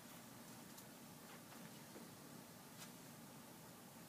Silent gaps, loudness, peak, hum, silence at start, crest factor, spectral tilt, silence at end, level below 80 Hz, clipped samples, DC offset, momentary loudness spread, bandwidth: none; -57 LUFS; -42 dBFS; none; 0 s; 18 dB; -3.5 dB/octave; 0 s; -86 dBFS; under 0.1%; under 0.1%; 2 LU; 15.5 kHz